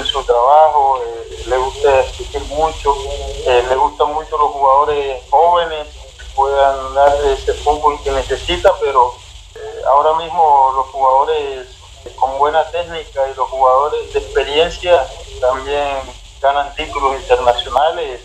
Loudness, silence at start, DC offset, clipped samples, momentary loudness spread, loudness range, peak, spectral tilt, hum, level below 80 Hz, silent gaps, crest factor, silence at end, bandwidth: -15 LUFS; 0 s; under 0.1%; under 0.1%; 11 LU; 2 LU; 0 dBFS; -3.5 dB/octave; none; -34 dBFS; none; 14 dB; 0 s; 12.5 kHz